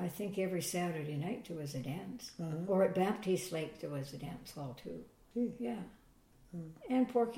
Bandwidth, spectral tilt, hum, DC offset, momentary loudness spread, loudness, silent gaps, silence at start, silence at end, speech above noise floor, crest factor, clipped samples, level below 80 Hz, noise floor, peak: 16.5 kHz; -6 dB/octave; none; under 0.1%; 16 LU; -38 LUFS; none; 0 s; 0 s; 27 dB; 18 dB; under 0.1%; -68 dBFS; -64 dBFS; -20 dBFS